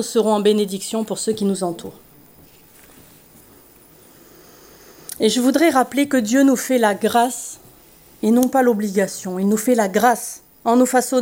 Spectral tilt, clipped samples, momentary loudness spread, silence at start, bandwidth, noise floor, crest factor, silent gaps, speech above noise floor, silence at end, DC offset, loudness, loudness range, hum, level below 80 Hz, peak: -4.5 dB/octave; under 0.1%; 12 LU; 0 s; 16.5 kHz; -48 dBFS; 18 dB; none; 31 dB; 0 s; under 0.1%; -18 LUFS; 10 LU; none; -62 dBFS; -2 dBFS